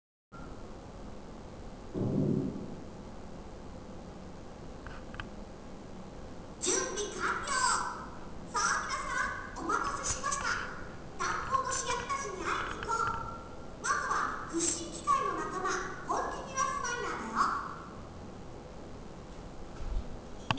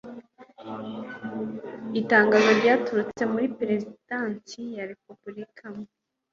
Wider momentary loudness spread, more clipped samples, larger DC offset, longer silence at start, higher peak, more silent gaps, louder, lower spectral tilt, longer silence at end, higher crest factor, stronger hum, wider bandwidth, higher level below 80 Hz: second, 17 LU vs 23 LU; neither; neither; first, 0.3 s vs 0.05 s; second, -10 dBFS vs -4 dBFS; neither; second, -33 LUFS vs -24 LUFS; second, -3 dB/octave vs -5.5 dB/octave; second, 0 s vs 0.45 s; about the same, 26 dB vs 22 dB; neither; about the same, 8 kHz vs 7.4 kHz; first, -50 dBFS vs -70 dBFS